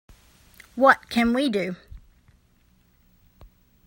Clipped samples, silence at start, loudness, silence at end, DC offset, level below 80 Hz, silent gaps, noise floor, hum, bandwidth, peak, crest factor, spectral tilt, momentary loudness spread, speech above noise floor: under 0.1%; 0.75 s; -21 LUFS; 1.9 s; under 0.1%; -52 dBFS; none; -61 dBFS; none; 16.5 kHz; 0 dBFS; 26 dB; -5 dB/octave; 19 LU; 40 dB